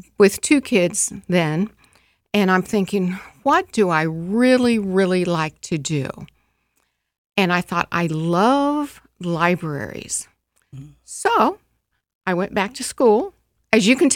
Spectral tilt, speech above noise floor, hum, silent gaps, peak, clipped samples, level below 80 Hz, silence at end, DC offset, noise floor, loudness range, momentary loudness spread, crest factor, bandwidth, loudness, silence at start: -4.5 dB/octave; 52 dB; none; 7.18-7.30 s, 12.15-12.21 s; -2 dBFS; under 0.1%; -56 dBFS; 0 s; under 0.1%; -70 dBFS; 4 LU; 10 LU; 18 dB; 17 kHz; -19 LUFS; 0.2 s